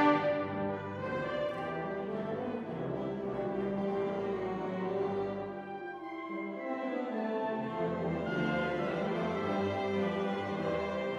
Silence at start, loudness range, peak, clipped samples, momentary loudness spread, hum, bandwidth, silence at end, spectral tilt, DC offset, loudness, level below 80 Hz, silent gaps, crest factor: 0 s; 3 LU; -14 dBFS; under 0.1%; 5 LU; none; 7.8 kHz; 0 s; -7.5 dB/octave; under 0.1%; -35 LUFS; -64 dBFS; none; 20 dB